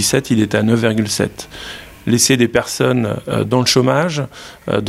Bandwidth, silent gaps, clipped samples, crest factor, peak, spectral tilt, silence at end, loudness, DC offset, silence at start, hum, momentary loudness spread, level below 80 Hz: 16 kHz; none; under 0.1%; 16 dB; 0 dBFS; -4.5 dB/octave; 0 s; -15 LUFS; under 0.1%; 0 s; none; 16 LU; -46 dBFS